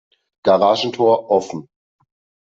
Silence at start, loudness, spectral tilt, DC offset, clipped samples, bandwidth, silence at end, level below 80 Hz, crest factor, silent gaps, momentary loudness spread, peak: 0.45 s; -17 LUFS; -5 dB/octave; under 0.1%; under 0.1%; 7.8 kHz; 0.85 s; -66 dBFS; 16 dB; none; 13 LU; -2 dBFS